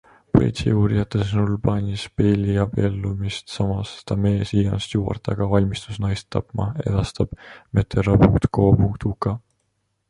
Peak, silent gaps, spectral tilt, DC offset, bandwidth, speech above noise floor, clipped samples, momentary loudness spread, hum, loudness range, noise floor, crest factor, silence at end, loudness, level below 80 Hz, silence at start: -2 dBFS; none; -7.5 dB/octave; under 0.1%; 10.5 kHz; 51 dB; under 0.1%; 10 LU; none; 3 LU; -71 dBFS; 18 dB; 0.7 s; -21 LUFS; -36 dBFS; 0.35 s